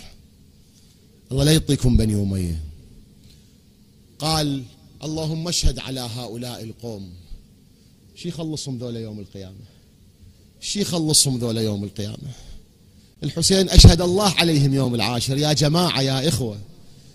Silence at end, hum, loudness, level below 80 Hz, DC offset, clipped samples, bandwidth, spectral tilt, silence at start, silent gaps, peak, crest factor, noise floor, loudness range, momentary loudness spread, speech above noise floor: 0.2 s; none; -20 LUFS; -28 dBFS; under 0.1%; under 0.1%; 15.5 kHz; -4.5 dB/octave; 0 s; none; 0 dBFS; 22 dB; -52 dBFS; 16 LU; 18 LU; 32 dB